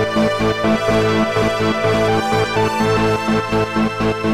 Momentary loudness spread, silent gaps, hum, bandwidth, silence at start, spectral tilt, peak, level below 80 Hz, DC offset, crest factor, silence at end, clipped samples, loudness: 2 LU; none; none; 16 kHz; 0 s; -5.5 dB/octave; -6 dBFS; -38 dBFS; 1%; 12 dB; 0 s; under 0.1%; -17 LUFS